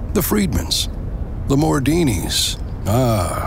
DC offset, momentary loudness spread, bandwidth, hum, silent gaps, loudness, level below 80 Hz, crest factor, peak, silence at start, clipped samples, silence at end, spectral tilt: under 0.1%; 9 LU; 16.5 kHz; none; none; -19 LUFS; -28 dBFS; 14 dB; -4 dBFS; 0 s; under 0.1%; 0 s; -5 dB/octave